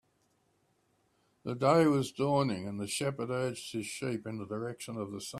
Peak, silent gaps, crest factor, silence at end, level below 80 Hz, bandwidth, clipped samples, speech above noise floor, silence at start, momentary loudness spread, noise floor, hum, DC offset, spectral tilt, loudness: -12 dBFS; none; 22 dB; 0 s; -72 dBFS; 15 kHz; under 0.1%; 41 dB; 1.45 s; 13 LU; -74 dBFS; none; under 0.1%; -5.5 dB/octave; -32 LUFS